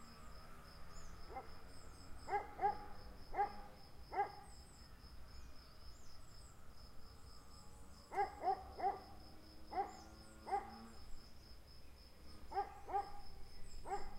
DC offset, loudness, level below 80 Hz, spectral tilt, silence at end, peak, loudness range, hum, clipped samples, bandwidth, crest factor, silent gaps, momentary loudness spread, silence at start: under 0.1%; -46 LUFS; -58 dBFS; -4.5 dB/octave; 0 s; -26 dBFS; 6 LU; none; under 0.1%; 16 kHz; 20 dB; none; 18 LU; 0 s